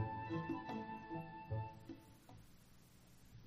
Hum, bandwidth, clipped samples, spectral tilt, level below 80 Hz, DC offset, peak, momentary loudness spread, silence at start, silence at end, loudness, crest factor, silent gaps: 60 Hz at -75 dBFS; 15.5 kHz; under 0.1%; -7.5 dB/octave; -68 dBFS; under 0.1%; -30 dBFS; 22 LU; 0 s; 0 s; -47 LUFS; 18 dB; none